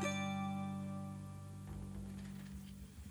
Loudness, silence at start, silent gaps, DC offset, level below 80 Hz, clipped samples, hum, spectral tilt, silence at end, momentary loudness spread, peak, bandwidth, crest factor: -46 LUFS; 0 s; none; under 0.1%; -58 dBFS; under 0.1%; 60 Hz at -65 dBFS; -5.5 dB/octave; 0 s; 11 LU; -28 dBFS; over 20 kHz; 16 dB